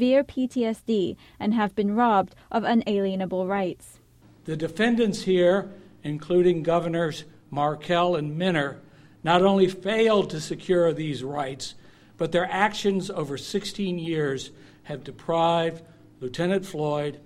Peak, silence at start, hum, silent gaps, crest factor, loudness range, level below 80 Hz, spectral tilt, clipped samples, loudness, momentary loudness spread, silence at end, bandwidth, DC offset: -4 dBFS; 0 s; none; none; 20 dB; 4 LU; -56 dBFS; -6 dB/octave; under 0.1%; -25 LUFS; 14 LU; 0.05 s; 13.5 kHz; under 0.1%